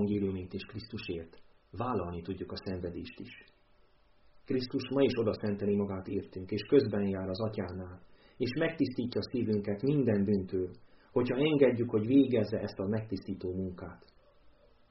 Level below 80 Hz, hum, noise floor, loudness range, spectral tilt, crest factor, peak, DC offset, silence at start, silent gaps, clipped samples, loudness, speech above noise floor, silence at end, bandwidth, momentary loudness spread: -62 dBFS; none; -64 dBFS; 10 LU; -6.5 dB/octave; 20 dB; -12 dBFS; under 0.1%; 0 s; none; under 0.1%; -32 LUFS; 32 dB; 0.4 s; 5.8 kHz; 15 LU